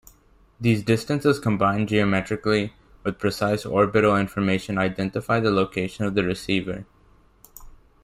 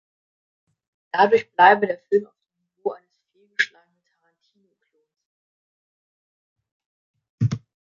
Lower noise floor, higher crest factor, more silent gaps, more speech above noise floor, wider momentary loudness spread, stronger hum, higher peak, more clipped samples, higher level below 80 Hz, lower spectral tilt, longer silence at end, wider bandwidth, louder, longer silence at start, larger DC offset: second, -56 dBFS vs -71 dBFS; second, 18 dB vs 24 dB; second, none vs 5.26-6.56 s, 6.72-6.80 s, 6.86-7.14 s, 7.30-7.38 s; second, 34 dB vs 53 dB; second, 6 LU vs 16 LU; neither; second, -6 dBFS vs -2 dBFS; neither; first, -50 dBFS vs -64 dBFS; about the same, -6.5 dB/octave vs -6 dB/octave; about the same, 0.35 s vs 0.35 s; first, 16 kHz vs 7.4 kHz; about the same, -23 LUFS vs -21 LUFS; second, 0.6 s vs 1.15 s; neither